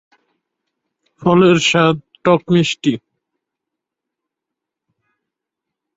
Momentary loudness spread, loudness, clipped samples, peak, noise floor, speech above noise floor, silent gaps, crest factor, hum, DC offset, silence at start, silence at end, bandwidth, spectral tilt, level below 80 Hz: 9 LU; -14 LUFS; under 0.1%; -2 dBFS; -82 dBFS; 69 dB; none; 18 dB; none; under 0.1%; 1.2 s; 3 s; 8 kHz; -5.5 dB/octave; -56 dBFS